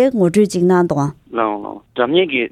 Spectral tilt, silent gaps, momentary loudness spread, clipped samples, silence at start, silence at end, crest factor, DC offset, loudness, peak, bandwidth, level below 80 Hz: -6 dB/octave; none; 8 LU; under 0.1%; 0 s; 0.05 s; 14 dB; under 0.1%; -16 LUFS; 0 dBFS; 13.5 kHz; -54 dBFS